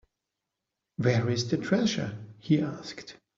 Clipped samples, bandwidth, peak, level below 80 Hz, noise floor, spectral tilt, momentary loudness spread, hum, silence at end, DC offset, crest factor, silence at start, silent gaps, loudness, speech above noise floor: under 0.1%; 7.6 kHz; -10 dBFS; -64 dBFS; -86 dBFS; -6 dB/octave; 16 LU; none; 0.25 s; under 0.1%; 20 dB; 1 s; none; -28 LUFS; 58 dB